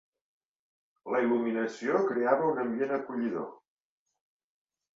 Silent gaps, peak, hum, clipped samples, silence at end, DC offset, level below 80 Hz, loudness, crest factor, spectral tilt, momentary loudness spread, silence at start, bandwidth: none; -10 dBFS; none; under 0.1%; 1.4 s; under 0.1%; -78 dBFS; -30 LUFS; 22 dB; -7 dB/octave; 8 LU; 1.05 s; 7.6 kHz